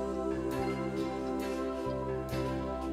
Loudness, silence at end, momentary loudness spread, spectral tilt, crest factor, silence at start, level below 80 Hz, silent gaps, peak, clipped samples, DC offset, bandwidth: -35 LUFS; 0 s; 2 LU; -7 dB/octave; 12 dB; 0 s; -48 dBFS; none; -22 dBFS; under 0.1%; under 0.1%; 16 kHz